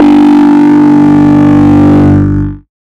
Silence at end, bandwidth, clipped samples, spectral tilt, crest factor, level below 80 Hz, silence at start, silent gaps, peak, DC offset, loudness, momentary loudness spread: 0.4 s; 6.2 kHz; 0.6%; -9 dB/octave; 4 dB; -28 dBFS; 0 s; none; 0 dBFS; under 0.1%; -5 LUFS; 6 LU